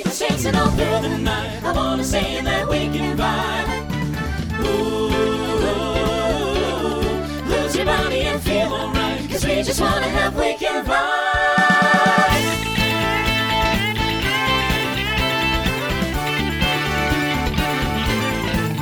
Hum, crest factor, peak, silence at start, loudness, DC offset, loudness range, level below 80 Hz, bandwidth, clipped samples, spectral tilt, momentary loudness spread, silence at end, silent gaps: none; 16 dB; -2 dBFS; 0 s; -19 LUFS; under 0.1%; 4 LU; -30 dBFS; over 20 kHz; under 0.1%; -4.5 dB/octave; 5 LU; 0 s; none